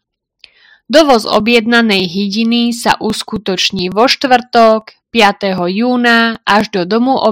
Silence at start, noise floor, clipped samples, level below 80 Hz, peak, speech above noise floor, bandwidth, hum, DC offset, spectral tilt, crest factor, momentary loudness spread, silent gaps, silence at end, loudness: 0.9 s; -47 dBFS; 1%; -48 dBFS; 0 dBFS; 36 dB; 16.5 kHz; none; 0.2%; -4 dB/octave; 12 dB; 6 LU; none; 0 s; -11 LUFS